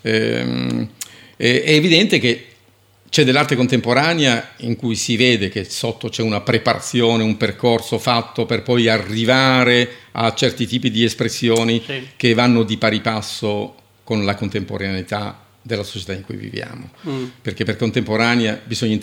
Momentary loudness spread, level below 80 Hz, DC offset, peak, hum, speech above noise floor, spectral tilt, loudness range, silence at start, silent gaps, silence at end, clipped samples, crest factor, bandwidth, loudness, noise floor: 13 LU; -56 dBFS; under 0.1%; 0 dBFS; none; 36 dB; -4.5 dB/octave; 8 LU; 0.05 s; none; 0 s; under 0.1%; 18 dB; 17 kHz; -17 LUFS; -53 dBFS